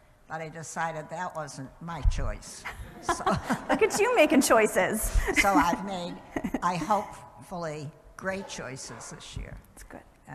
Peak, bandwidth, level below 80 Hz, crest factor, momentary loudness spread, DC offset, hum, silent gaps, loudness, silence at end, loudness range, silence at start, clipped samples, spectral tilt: -8 dBFS; 13.5 kHz; -38 dBFS; 20 dB; 19 LU; under 0.1%; none; none; -27 LUFS; 0 s; 11 LU; 0.3 s; under 0.1%; -4 dB/octave